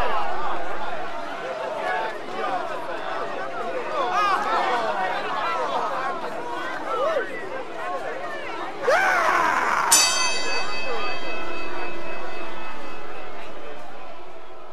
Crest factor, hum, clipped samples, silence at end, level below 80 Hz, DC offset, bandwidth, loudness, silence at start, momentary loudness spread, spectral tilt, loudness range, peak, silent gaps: 18 dB; none; under 0.1%; 0 s; -58 dBFS; under 0.1%; 15 kHz; -25 LUFS; 0 s; 17 LU; -1 dB/octave; 10 LU; -4 dBFS; none